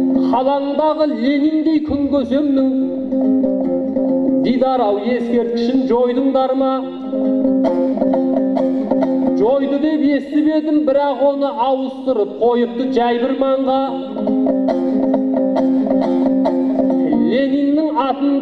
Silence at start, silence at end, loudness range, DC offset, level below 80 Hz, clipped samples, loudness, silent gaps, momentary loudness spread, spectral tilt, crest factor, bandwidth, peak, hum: 0 s; 0 s; 1 LU; under 0.1%; -50 dBFS; under 0.1%; -16 LUFS; none; 3 LU; -8 dB/octave; 14 dB; 5.8 kHz; -2 dBFS; none